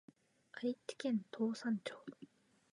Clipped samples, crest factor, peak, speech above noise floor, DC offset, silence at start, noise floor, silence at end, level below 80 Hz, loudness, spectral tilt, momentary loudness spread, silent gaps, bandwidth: under 0.1%; 16 dB; -26 dBFS; 19 dB; under 0.1%; 0.55 s; -59 dBFS; 0.5 s; under -90 dBFS; -41 LUFS; -5.5 dB/octave; 18 LU; none; 11 kHz